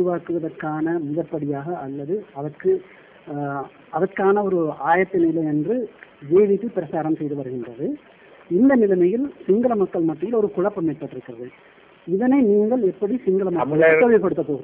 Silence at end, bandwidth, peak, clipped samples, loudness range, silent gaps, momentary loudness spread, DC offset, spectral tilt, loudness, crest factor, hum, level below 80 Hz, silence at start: 0 s; 3.7 kHz; -4 dBFS; under 0.1%; 6 LU; none; 14 LU; under 0.1%; -12 dB/octave; -21 LUFS; 16 dB; none; -62 dBFS; 0 s